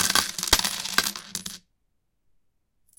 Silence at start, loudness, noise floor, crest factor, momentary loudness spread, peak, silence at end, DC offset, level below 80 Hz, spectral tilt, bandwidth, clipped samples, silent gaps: 0 s; -24 LUFS; -75 dBFS; 28 dB; 15 LU; -2 dBFS; 1.4 s; under 0.1%; -48 dBFS; 0 dB/octave; 17.5 kHz; under 0.1%; none